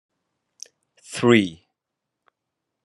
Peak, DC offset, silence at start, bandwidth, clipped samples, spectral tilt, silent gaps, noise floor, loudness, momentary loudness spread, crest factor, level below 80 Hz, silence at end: -2 dBFS; under 0.1%; 1.1 s; 11.5 kHz; under 0.1%; -5 dB/octave; none; -83 dBFS; -19 LUFS; 25 LU; 24 dB; -70 dBFS; 1.3 s